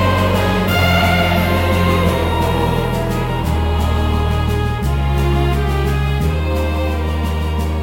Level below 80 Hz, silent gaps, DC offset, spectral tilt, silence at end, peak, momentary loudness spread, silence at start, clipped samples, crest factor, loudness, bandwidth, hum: -22 dBFS; none; under 0.1%; -6.5 dB/octave; 0 s; -2 dBFS; 5 LU; 0 s; under 0.1%; 14 dB; -17 LUFS; 16.5 kHz; none